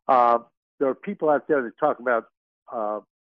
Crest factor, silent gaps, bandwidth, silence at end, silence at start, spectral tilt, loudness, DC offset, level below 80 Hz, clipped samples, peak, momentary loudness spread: 18 dB; 0.57-0.78 s, 2.37-2.66 s; 5.8 kHz; 0.35 s; 0.1 s; -8.5 dB/octave; -24 LUFS; under 0.1%; -78 dBFS; under 0.1%; -6 dBFS; 11 LU